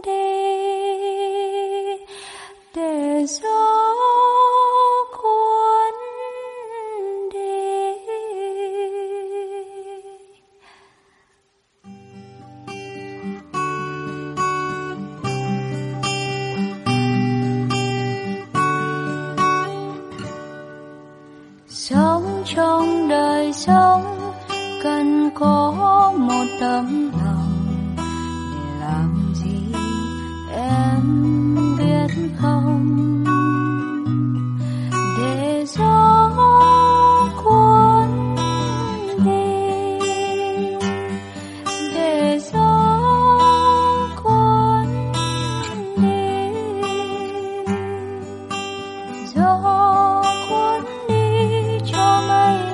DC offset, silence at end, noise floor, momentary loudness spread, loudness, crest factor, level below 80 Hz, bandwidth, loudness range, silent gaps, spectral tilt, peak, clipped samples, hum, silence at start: under 0.1%; 0 s; -63 dBFS; 15 LU; -19 LUFS; 16 dB; -44 dBFS; 11.5 kHz; 11 LU; none; -6 dB/octave; -2 dBFS; under 0.1%; none; 0.05 s